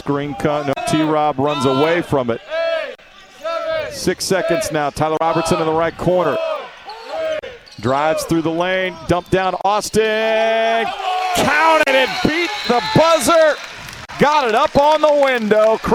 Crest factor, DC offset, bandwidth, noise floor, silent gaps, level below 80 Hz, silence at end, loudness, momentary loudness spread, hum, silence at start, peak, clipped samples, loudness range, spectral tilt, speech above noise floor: 16 dB; under 0.1%; 16.5 kHz; -42 dBFS; none; -44 dBFS; 0 s; -16 LUFS; 11 LU; none; 0.05 s; 0 dBFS; under 0.1%; 5 LU; -4.5 dB/octave; 26 dB